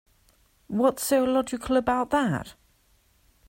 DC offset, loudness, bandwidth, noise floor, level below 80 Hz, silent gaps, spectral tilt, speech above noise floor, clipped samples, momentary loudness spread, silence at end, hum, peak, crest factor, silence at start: under 0.1%; -25 LUFS; 16.5 kHz; -64 dBFS; -54 dBFS; none; -5 dB/octave; 40 dB; under 0.1%; 10 LU; 0.95 s; none; -10 dBFS; 18 dB; 0.7 s